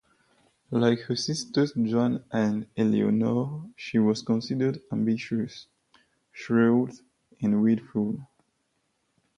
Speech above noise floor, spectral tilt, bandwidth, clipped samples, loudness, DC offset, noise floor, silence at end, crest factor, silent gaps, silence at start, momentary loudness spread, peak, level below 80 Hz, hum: 49 dB; -6.5 dB/octave; 10.5 kHz; under 0.1%; -26 LUFS; under 0.1%; -74 dBFS; 1.15 s; 18 dB; none; 0.7 s; 9 LU; -10 dBFS; -66 dBFS; none